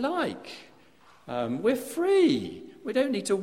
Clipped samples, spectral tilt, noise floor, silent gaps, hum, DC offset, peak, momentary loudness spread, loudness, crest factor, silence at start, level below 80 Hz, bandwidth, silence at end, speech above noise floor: under 0.1%; -5 dB/octave; -58 dBFS; none; none; under 0.1%; -12 dBFS; 18 LU; -27 LUFS; 16 dB; 0 s; -68 dBFS; 16 kHz; 0 s; 31 dB